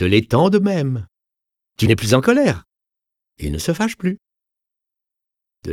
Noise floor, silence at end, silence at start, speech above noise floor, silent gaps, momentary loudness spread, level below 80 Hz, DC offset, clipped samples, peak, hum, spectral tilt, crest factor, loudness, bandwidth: -84 dBFS; 0 s; 0 s; 68 dB; none; 14 LU; -40 dBFS; under 0.1%; under 0.1%; 0 dBFS; none; -6 dB/octave; 20 dB; -18 LUFS; 17 kHz